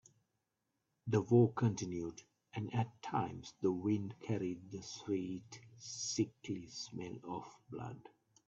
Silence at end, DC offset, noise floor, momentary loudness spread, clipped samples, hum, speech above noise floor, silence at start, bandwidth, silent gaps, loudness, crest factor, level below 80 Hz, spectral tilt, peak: 0.4 s; under 0.1%; -86 dBFS; 16 LU; under 0.1%; none; 48 dB; 1.05 s; 8 kHz; none; -39 LUFS; 22 dB; -74 dBFS; -6 dB/octave; -18 dBFS